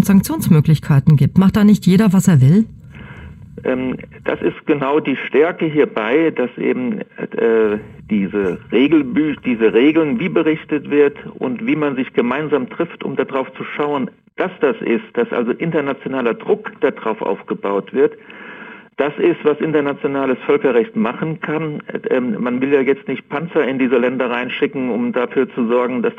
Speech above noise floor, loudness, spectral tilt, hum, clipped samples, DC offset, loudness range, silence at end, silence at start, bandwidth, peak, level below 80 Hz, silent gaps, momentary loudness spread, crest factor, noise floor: 20 dB; -17 LUFS; -7.5 dB/octave; none; under 0.1%; under 0.1%; 5 LU; 0 s; 0 s; 15 kHz; 0 dBFS; -48 dBFS; none; 11 LU; 16 dB; -36 dBFS